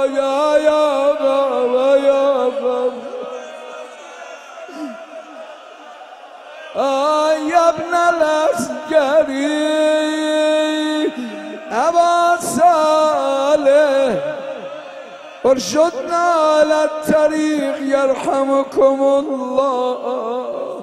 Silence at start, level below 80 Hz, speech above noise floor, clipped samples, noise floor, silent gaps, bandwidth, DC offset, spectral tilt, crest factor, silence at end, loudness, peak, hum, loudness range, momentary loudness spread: 0 s; -58 dBFS; 22 dB; under 0.1%; -37 dBFS; none; 13.5 kHz; under 0.1%; -3.5 dB/octave; 14 dB; 0 s; -16 LUFS; -2 dBFS; none; 9 LU; 20 LU